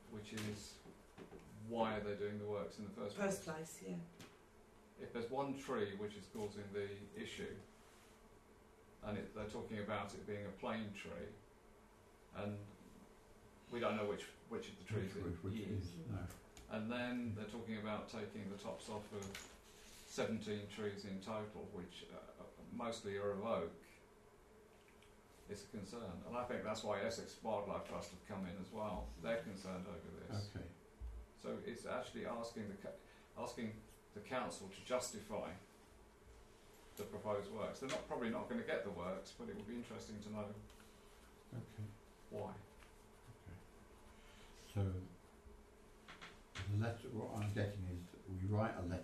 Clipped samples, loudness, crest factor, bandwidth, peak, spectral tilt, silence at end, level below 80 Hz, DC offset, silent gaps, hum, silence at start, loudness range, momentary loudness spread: under 0.1%; -47 LUFS; 22 dB; 13 kHz; -26 dBFS; -5.5 dB/octave; 0 s; -66 dBFS; under 0.1%; none; none; 0 s; 6 LU; 21 LU